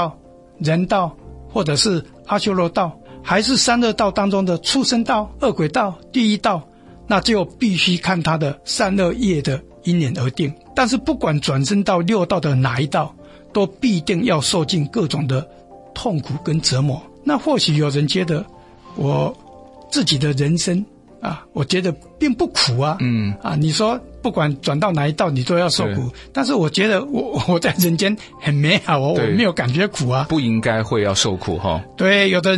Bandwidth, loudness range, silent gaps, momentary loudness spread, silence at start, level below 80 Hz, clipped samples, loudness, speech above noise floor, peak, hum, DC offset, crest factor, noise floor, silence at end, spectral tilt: 12 kHz; 3 LU; none; 8 LU; 0 s; -46 dBFS; under 0.1%; -18 LUFS; 25 dB; -2 dBFS; none; under 0.1%; 16 dB; -43 dBFS; 0 s; -5 dB/octave